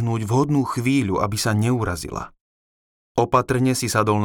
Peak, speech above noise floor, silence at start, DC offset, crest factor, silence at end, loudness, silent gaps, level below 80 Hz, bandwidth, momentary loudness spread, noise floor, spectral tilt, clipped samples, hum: -4 dBFS; over 70 dB; 0 s; under 0.1%; 18 dB; 0 s; -21 LUFS; 2.41-3.15 s; -46 dBFS; 18.5 kHz; 9 LU; under -90 dBFS; -5.5 dB/octave; under 0.1%; none